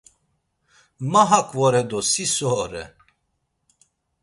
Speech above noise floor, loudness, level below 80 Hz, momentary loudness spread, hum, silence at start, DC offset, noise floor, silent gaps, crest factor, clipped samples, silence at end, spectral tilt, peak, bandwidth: 53 dB; -20 LUFS; -56 dBFS; 16 LU; none; 1 s; under 0.1%; -73 dBFS; none; 22 dB; under 0.1%; 1.35 s; -3.5 dB/octave; -2 dBFS; 11.5 kHz